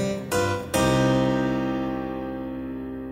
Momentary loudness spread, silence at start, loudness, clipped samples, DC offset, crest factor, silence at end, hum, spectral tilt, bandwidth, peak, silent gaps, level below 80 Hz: 12 LU; 0 s; -25 LUFS; under 0.1%; under 0.1%; 16 dB; 0 s; none; -5.5 dB/octave; 16 kHz; -10 dBFS; none; -44 dBFS